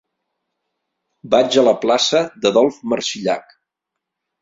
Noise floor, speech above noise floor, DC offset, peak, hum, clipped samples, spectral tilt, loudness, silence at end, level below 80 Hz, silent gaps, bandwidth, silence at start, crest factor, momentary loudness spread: -81 dBFS; 65 dB; under 0.1%; -2 dBFS; none; under 0.1%; -3.5 dB/octave; -17 LUFS; 1 s; -62 dBFS; none; 7.8 kHz; 1.25 s; 18 dB; 8 LU